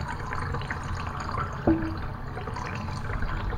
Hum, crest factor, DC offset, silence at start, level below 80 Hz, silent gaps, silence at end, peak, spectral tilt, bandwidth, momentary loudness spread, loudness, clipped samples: none; 20 dB; under 0.1%; 0 s; -36 dBFS; none; 0 s; -10 dBFS; -7 dB/octave; 15.5 kHz; 9 LU; -31 LUFS; under 0.1%